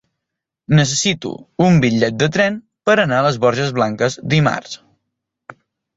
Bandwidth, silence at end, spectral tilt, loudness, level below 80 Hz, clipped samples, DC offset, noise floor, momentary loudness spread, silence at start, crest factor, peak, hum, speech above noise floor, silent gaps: 8 kHz; 0.45 s; -5 dB/octave; -16 LUFS; -52 dBFS; under 0.1%; under 0.1%; -81 dBFS; 10 LU; 0.7 s; 16 dB; -2 dBFS; none; 65 dB; none